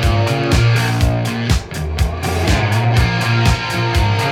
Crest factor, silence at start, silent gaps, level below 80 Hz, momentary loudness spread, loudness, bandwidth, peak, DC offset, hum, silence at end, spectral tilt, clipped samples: 14 dB; 0 s; none; -22 dBFS; 5 LU; -16 LUFS; 15.5 kHz; -2 dBFS; under 0.1%; none; 0 s; -5.5 dB/octave; under 0.1%